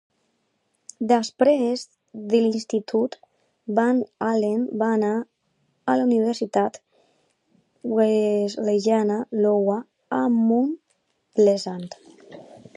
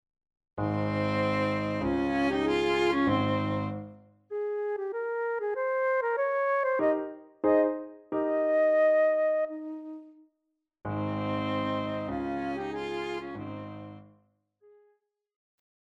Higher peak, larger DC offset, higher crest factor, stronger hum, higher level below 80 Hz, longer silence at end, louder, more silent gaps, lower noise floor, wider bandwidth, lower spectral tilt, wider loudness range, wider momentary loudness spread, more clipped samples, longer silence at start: first, -6 dBFS vs -14 dBFS; neither; about the same, 18 dB vs 16 dB; neither; second, -76 dBFS vs -58 dBFS; second, 0.2 s vs 1.9 s; first, -22 LUFS vs -29 LUFS; neither; second, -71 dBFS vs -81 dBFS; about the same, 11 kHz vs 10 kHz; second, -6 dB/octave vs -7.5 dB/octave; second, 2 LU vs 8 LU; second, 12 LU vs 15 LU; neither; first, 1 s vs 0.55 s